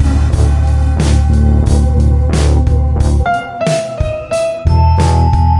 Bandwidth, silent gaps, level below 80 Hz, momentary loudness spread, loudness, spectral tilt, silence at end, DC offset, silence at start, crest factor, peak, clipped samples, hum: 11.5 kHz; none; -14 dBFS; 5 LU; -12 LUFS; -7 dB/octave; 0 s; under 0.1%; 0 s; 10 dB; 0 dBFS; under 0.1%; none